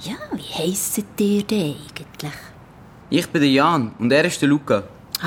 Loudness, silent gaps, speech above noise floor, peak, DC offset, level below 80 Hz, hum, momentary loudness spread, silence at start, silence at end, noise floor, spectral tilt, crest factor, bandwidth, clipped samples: -20 LUFS; none; 24 dB; -4 dBFS; under 0.1%; -54 dBFS; none; 16 LU; 0 s; 0 s; -44 dBFS; -4.5 dB/octave; 18 dB; 18.5 kHz; under 0.1%